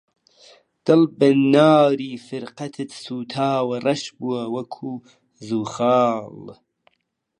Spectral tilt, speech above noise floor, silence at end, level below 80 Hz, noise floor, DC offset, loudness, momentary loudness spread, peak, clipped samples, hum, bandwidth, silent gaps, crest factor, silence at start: -6.5 dB/octave; 53 dB; 0.85 s; -72 dBFS; -73 dBFS; under 0.1%; -20 LUFS; 18 LU; -2 dBFS; under 0.1%; none; 10.5 kHz; none; 20 dB; 0.85 s